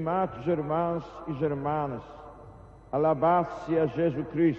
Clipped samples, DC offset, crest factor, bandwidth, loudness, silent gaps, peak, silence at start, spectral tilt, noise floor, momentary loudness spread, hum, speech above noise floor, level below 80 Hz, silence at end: under 0.1%; under 0.1%; 16 dB; 6.8 kHz; -28 LUFS; none; -12 dBFS; 0 s; -9.5 dB/octave; -49 dBFS; 14 LU; none; 21 dB; -56 dBFS; 0 s